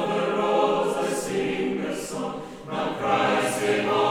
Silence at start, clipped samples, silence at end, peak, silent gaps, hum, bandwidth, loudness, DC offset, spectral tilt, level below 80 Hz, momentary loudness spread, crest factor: 0 s; under 0.1%; 0 s; -10 dBFS; none; none; 16.5 kHz; -25 LUFS; under 0.1%; -4.5 dB/octave; -60 dBFS; 9 LU; 16 dB